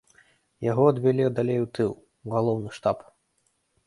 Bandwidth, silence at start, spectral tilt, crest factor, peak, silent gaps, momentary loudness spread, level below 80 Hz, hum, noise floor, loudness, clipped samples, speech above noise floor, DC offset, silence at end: 11.5 kHz; 0.6 s; -8.5 dB/octave; 20 dB; -6 dBFS; none; 10 LU; -62 dBFS; none; -72 dBFS; -25 LUFS; under 0.1%; 48 dB; under 0.1%; 0.85 s